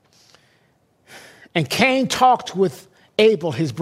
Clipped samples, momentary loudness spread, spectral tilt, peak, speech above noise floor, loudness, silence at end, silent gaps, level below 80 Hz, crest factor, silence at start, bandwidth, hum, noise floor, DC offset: under 0.1%; 8 LU; -4.5 dB/octave; -2 dBFS; 43 dB; -18 LUFS; 0 s; none; -60 dBFS; 18 dB; 1.15 s; 16 kHz; none; -61 dBFS; under 0.1%